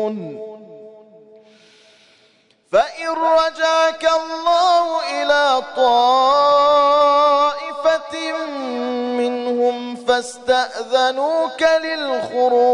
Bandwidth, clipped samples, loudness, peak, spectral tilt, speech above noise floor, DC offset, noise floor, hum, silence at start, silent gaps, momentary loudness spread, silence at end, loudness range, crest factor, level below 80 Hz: 11 kHz; under 0.1%; -17 LUFS; -4 dBFS; -2.5 dB/octave; 40 dB; under 0.1%; -56 dBFS; none; 0 s; none; 10 LU; 0 s; 6 LU; 14 dB; -60 dBFS